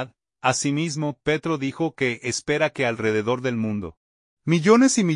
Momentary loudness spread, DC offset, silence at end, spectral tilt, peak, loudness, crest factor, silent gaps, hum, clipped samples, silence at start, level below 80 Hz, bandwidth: 11 LU; under 0.1%; 0 s; -5 dB/octave; -2 dBFS; -22 LUFS; 20 dB; 3.97-4.37 s; none; under 0.1%; 0 s; -60 dBFS; 11 kHz